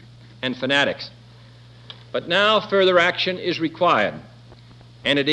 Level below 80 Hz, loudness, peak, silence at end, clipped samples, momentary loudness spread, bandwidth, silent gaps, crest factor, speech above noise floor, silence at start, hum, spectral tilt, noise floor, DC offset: -60 dBFS; -20 LUFS; -4 dBFS; 0 s; under 0.1%; 17 LU; 9.6 kHz; none; 18 dB; 26 dB; 0.4 s; none; -4.5 dB/octave; -46 dBFS; under 0.1%